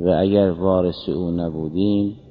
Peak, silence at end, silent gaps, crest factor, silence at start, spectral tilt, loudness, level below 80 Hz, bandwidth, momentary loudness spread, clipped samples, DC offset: -4 dBFS; 0.1 s; none; 16 dB; 0 s; -11 dB/octave; -20 LUFS; -40 dBFS; 5.2 kHz; 7 LU; under 0.1%; under 0.1%